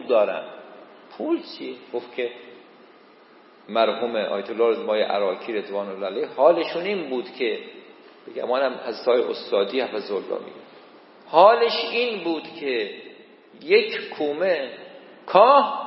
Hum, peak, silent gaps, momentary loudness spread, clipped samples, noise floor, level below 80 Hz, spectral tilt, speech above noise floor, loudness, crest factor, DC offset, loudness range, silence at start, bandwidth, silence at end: none; 0 dBFS; none; 18 LU; under 0.1%; -51 dBFS; -88 dBFS; -8.5 dB/octave; 29 dB; -22 LUFS; 22 dB; under 0.1%; 7 LU; 0 s; 5.8 kHz; 0 s